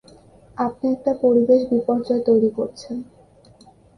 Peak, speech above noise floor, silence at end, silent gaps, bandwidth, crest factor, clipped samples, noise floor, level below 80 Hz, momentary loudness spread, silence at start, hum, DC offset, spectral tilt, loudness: -4 dBFS; 31 dB; 0.95 s; none; 10 kHz; 16 dB; under 0.1%; -50 dBFS; -58 dBFS; 16 LU; 0.6 s; none; under 0.1%; -7.5 dB/octave; -20 LUFS